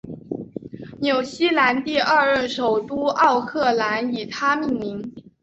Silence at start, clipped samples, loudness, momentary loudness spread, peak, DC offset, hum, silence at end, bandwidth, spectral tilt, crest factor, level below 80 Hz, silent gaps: 0.05 s; under 0.1%; -20 LUFS; 15 LU; -4 dBFS; under 0.1%; none; 0.25 s; 8.2 kHz; -4.5 dB/octave; 16 dB; -58 dBFS; none